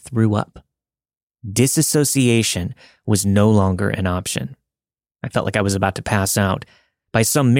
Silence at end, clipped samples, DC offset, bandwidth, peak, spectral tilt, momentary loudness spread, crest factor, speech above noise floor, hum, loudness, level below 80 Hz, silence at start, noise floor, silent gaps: 0 s; under 0.1%; under 0.1%; 16.5 kHz; -2 dBFS; -5 dB/octave; 12 LU; 18 dB; over 72 dB; none; -18 LUFS; -50 dBFS; 0.05 s; under -90 dBFS; 1.23-1.27 s